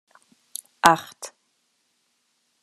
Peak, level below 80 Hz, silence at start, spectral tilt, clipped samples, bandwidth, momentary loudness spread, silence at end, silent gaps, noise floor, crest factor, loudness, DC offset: 0 dBFS; -66 dBFS; 0.85 s; -2.5 dB/octave; under 0.1%; 13.5 kHz; 21 LU; 1.35 s; none; -71 dBFS; 28 dB; -20 LUFS; under 0.1%